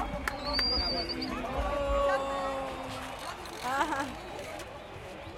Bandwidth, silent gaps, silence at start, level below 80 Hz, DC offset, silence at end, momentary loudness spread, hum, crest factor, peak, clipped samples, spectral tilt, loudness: 16.5 kHz; none; 0 s; -44 dBFS; under 0.1%; 0 s; 13 LU; none; 20 dB; -12 dBFS; under 0.1%; -4 dB/octave; -32 LUFS